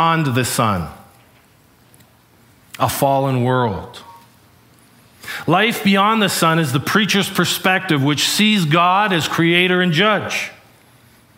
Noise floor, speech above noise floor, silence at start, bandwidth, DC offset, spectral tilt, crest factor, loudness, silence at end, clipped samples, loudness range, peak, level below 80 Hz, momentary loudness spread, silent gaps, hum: -52 dBFS; 35 dB; 0 s; 16.5 kHz; under 0.1%; -4.5 dB/octave; 18 dB; -16 LUFS; 0.85 s; under 0.1%; 7 LU; 0 dBFS; -52 dBFS; 10 LU; none; none